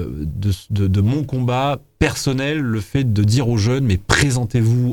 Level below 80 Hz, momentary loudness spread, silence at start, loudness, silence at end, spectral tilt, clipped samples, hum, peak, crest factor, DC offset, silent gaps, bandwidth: -36 dBFS; 6 LU; 0 s; -18 LUFS; 0 s; -6 dB/octave; under 0.1%; none; 0 dBFS; 18 dB; under 0.1%; none; 18 kHz